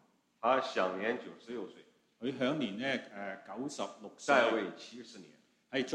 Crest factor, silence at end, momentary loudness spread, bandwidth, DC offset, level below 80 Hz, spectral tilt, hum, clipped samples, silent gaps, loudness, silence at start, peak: 22 dB; 0 s; 19 LU; 10.5 kHz; under 0.1%; -82 dBFS; -4 dB/octave; none; under 0.1%; none; -35 LUFS; 0.45 s; -14 dBFS